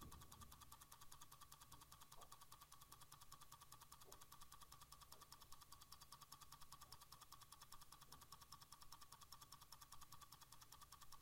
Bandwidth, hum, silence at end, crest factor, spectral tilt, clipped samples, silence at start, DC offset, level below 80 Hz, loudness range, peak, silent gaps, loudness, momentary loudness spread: 16.5 kHz; none; 0 s; 22 dB; -2 dB/octave; under 0.1%; 0 s; under 0.1%; -74 dBFS; 1 LU; -42 dBFS; none; -63 LUFS; 2 LU